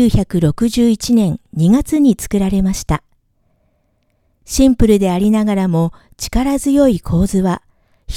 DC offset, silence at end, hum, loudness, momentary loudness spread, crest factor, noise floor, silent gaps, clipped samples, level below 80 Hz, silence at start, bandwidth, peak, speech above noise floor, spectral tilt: under 0.1%; 0 s; none; -15 LUFS; 9 LU; 14 dB; -61 dBFS; none; under 0.1%; -28 dBFS; 0 s; 16 kHz; 0 dBFS; 48 dB; -6.5 dB/octave